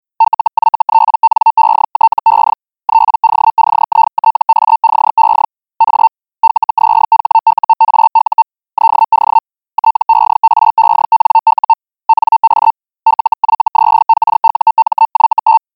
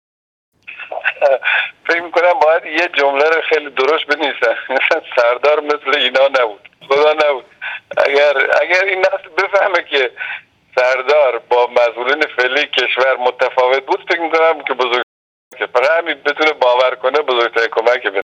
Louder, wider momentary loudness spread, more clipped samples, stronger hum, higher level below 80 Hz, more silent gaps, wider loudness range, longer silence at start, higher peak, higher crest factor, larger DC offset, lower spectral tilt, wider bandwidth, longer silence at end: first, -10 LUFS vs -14 LUFS; about the same, 5 LU vs 7 LU; neither; neither; first, -60 dBFS vs -68 dBFS; second, none vs 15.03-15.51 s; about the same, 1 LU vs 1 LU; second, 0.2 s vs 0.7 s; about the same, -2 dBFS vs 0 dBFS; about the same, 10 dB vs 14 dB; first, 0.1% vs under 0.1%; first, -5 dB/octave vs -2 dB/octave; second, 4.9 kHz vs 8.2 kHz; first, 0.2 s vs 0 s